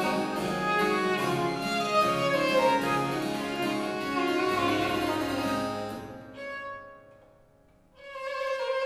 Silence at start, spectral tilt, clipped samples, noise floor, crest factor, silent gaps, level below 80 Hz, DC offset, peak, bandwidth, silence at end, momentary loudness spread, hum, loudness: 0 s; -4.5 dB/octave; under 0.1%; -60 dBFS; 16 dB; none; -58 dBFS; under 0.1%; -12 dBFS; 16 kHz; 0 s; 14 LU; none; -28 LUFS